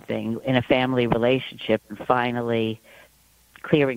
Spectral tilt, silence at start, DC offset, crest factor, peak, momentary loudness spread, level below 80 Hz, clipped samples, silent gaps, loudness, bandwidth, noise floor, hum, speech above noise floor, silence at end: -7.5 dB/octave; 0.1 s; under 0.1%; 20 dB; -2 dBFS; 8 LU; -54 dBFS; under 0.1%; none; -23 LUFS; 16 kHz; -58 dBFS; none; 35 dB; 0 s